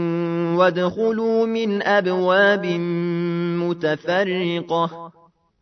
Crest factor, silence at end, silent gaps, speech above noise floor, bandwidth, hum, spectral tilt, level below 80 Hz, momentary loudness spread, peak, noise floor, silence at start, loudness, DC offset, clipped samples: 16 dB; 0.5 s; none; 37 dB; 6.4 kHz; none; -7 dB/octave; -66 dBFS; 6 LU; -4 dBFS; -56 dBFS; 0 s; -20 LUFS; under 0.1%; under 0.1%